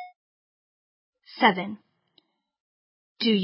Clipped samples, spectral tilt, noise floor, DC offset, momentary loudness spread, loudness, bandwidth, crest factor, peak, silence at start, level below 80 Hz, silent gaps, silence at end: under 0.1%; -9 dB/octave; -67 dBFS; under 0.1%; 24 LU; -24 LUFS; 5.8 kHz; 24 dB; -4 dBFS; 0 s; -84 dBFS; 0.16-1.13 s, 2.60-3.16 s; 0 s